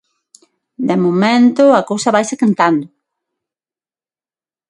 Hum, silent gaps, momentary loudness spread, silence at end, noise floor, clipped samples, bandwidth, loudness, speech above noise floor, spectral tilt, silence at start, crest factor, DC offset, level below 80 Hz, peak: none; none; 7 LU; 1.85 s; under -90 dBFS; under 0.1%; 11.5 kHz; -13 LUFS; over 78 dB; -5.5 dB/octave; 0.8 s; 16 dB; under 0.1%; -64 dBFS; 0 dBFS